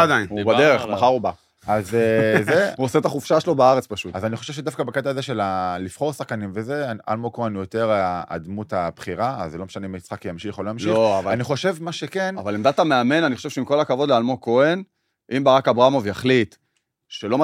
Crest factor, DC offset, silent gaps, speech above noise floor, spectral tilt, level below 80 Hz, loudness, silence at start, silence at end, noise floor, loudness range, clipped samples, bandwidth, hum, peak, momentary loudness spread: 18 dB; under 0.1%; none; 46 dB; -5.5 dB/octave; -60 dBFS; -21 LUFS; 0 s; 0 s; -66 dBFS; 6 LU; under 0.1%; 15.5 kHz; none; -2 dBFS; 12 LU